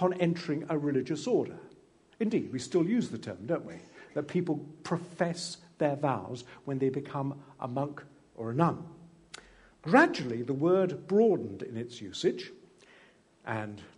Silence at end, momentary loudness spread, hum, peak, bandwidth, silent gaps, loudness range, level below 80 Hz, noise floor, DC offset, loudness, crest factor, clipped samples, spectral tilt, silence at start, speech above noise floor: 0.1 s; 16 LU; none; -8 dBFS; 10.5 kHz; none; 6 LU; -72 dBFS; -61 dBFS; under 0.1%; -31 LUFS; 24 dB; under 0.1%; -6.5 dB/octave; 0 s; 31 dB